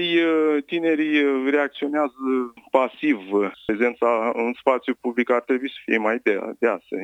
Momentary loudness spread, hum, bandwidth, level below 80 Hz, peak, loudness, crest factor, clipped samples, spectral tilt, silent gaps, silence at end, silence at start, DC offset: 5 LU; none; 8.8 kHz; -66 dBFS; -2 dBFS; -22 LUFS; 20 dB; under 0.1%; -6 dB/octave; none; 0 s; 0 s; under 0.1%